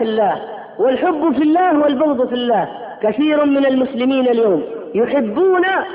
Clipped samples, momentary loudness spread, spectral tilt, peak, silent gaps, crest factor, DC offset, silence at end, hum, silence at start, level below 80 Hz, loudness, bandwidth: under 0.1%; 6 LU; -10.5 dB/octave; -6 dBFS; none; 10 dB; under 0.1%; 0 s; none; 0 s; -58 dBFS; -16 LUFS; 5 kHz